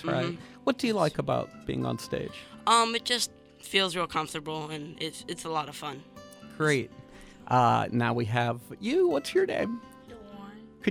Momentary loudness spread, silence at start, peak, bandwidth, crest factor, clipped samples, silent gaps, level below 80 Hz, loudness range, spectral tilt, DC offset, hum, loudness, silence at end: 21 LU; 0 s; -8 dBFS; 16.5 kHz; 22 dB; under 0.1%; none; -60 dBFS; 4 LU; -4.5 dB/octave; under 0.1%; none; -29 LUFS; 0 s